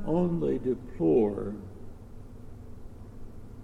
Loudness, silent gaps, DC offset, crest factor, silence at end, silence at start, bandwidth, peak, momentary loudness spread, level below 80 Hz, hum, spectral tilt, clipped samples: -28 LUFS; none; under 0.1%; 18 dB; 0 s; 0 s; 10 kHz; -14 dBFS; 23 LU; -46 dBFS; none; -10 dB/octave; under 0.1%